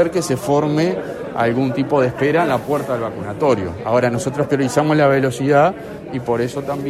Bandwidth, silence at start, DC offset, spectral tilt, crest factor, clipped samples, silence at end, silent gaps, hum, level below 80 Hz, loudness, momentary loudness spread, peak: 15 kHz; 0 s; under 0.1%; -6.5 dB/octave; 16 dB; under 0.1%; 0 s; none; none; -50 dBFS; -18 LUFS; 8 LU; -2 dBFS